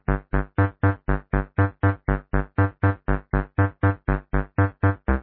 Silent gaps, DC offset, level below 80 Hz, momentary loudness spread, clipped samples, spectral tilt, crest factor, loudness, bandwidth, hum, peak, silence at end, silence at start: none; under 0.1%; -30 dBFS; 5 LU; under 0.1%; -12.5 dB/octave; 16 dB; -24 LUFS; 3.6 kHz; none; -6 dBFS; 0 s; 0.1 s